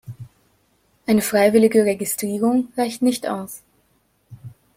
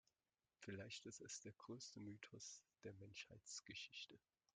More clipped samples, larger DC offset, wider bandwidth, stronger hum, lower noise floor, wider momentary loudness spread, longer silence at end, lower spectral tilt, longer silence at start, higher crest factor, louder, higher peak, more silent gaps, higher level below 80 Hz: neither; neither; first, 16.5 kHz vs 10 kHz; neither; second, -64 dBFS vs under -90 dBFS; first, 21 LU vs 6 LU; about the same, 0.3 s vs 0.4 s; first, -5 dB/octave vs -3 dB/octave; second, 0.05 s vs 0.6 s; about the same, 20 dB vs 20 dB; first, -19 LUFS vs -57 LUFS; first, -2 dBFS vs -40 dBFS; neither; first, -60 dBFS vs -88 dBFS